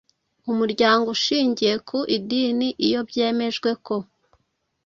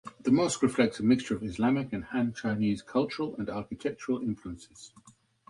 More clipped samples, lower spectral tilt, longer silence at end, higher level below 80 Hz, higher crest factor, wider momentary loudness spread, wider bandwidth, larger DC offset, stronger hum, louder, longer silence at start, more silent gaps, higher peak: neither; second, -4 dB/octave vs -5.5 dB/octave; first, 0.8 s vs 0.4 s; second, -64 dBFS vs -58 dBFS; about the same, 20 dB vs 20 dB; about the same, 9 LU vs 11 LU; second, 7.6 kHz vs 11.5 kHz; neither; neither; first, -22 LUFS vs -30 LUFS; first, 0.45 s vs 0.05 s; neither; first, -4 dBFS vs -10 dBFS